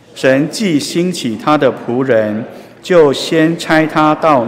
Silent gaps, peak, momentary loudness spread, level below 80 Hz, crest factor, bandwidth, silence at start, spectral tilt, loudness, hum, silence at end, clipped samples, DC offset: none; 0 dBFS; 7 LU; -52 dBFS; 12 dB; 16 kHz; 0.15 s; -5.5 dB/octave; -13 LUFS; none; 0 s; under 0.1%; under 0.1%